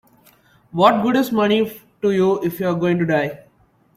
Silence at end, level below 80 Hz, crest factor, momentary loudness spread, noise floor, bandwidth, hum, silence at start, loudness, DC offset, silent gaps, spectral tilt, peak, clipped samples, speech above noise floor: 0.6 s; -60 dBFS; 18 dB; 9 LU; -57 dBFS; 16 kHz; none; 0.75 s; -18 LUFS; under 0.1%; none; -6.5 dB/octave; -2 dBFS; under 0.1%; 39 dB